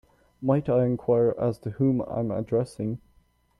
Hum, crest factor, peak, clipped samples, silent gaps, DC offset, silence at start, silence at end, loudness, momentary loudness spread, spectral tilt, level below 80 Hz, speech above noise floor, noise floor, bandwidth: none; 16 dB; -12 dBFS; under 0.1%; none; under 0.1%; 0.4 s; 0.65 s; -26 LUFS; 10 LU; -10 dB/octave; -58 dBFS; 38 dB; -63 dBFS; 11 kHz